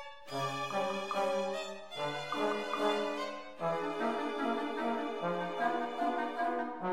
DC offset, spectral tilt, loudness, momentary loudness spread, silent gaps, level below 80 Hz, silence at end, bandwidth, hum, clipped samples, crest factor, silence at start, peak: 0.2%; -4.5 dB/octave; -35 LUFS; 5 LU; none; -78 dBFS; 0 s; 16 kHz; none; under 0.1%; 16 dB; 0 s; -18 dBFS